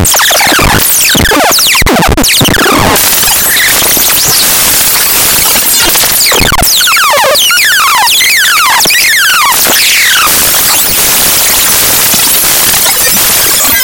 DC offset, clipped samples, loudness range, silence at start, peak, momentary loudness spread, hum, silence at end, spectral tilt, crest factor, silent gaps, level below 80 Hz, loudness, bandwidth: under 0.1%; 3%; 1 LU; 0 s; 0 dBFS; 1 LU; none; 0 s; -1 dB/octave; 6 dB; none; -24 dBFS; -3 LUFS; over 20 kHz